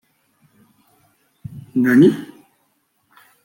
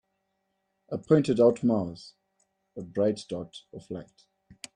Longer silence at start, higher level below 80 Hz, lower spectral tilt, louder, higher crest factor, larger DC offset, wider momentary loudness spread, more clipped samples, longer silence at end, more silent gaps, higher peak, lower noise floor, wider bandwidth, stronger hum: first, 1.5 s vs 0.9 s; about the same, -64 dBFS vs -66 dBFS; about the same, -7.5 dB/octave vs -7.5 dB/octave; first, -15 LUFS vs -27 LUFS; about the same, 18 dB vs 22 dB; neither; first, 27 LU vs 23 LU; neither; first, 1.2 s vs 0.75 s; neither; first, -2 dBFS vs -8 dBFS; second, -66 dBFS vs -78 dBFS; first, 16.5 kHz vs 11 kHz; neither